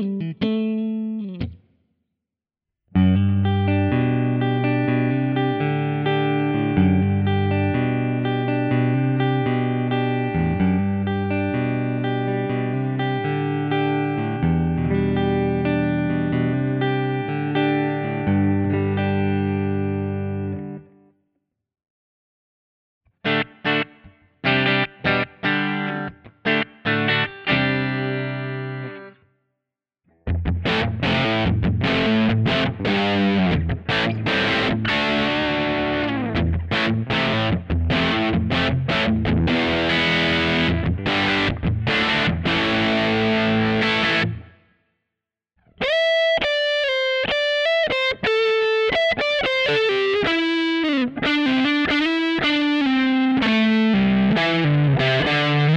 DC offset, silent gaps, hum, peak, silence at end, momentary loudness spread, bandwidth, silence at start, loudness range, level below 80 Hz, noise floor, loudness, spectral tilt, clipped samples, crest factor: under 0.1%; 21.90-23.01 s; none; -4 dBFS; 0 s; 6 LU; 8.8 kHz; 0 s; 5 LU; -40 dBFS; -86 dBFS; -20 LUFS; -7 dB/octave; under 0.1%; 16 dB